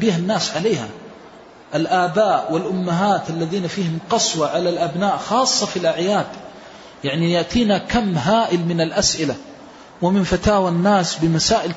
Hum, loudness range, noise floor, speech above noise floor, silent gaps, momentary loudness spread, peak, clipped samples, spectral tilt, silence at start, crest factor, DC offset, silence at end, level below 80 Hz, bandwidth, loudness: none; 2 LU; -42 dBFS; 24 dB; none; 8 LU; -4 dBFS; under 0.1%; -4.5 dB/octave; 0 s; 14 dB; under 0.1%; 0 s; -44 dBFS; 8 kHz; -19 LUFS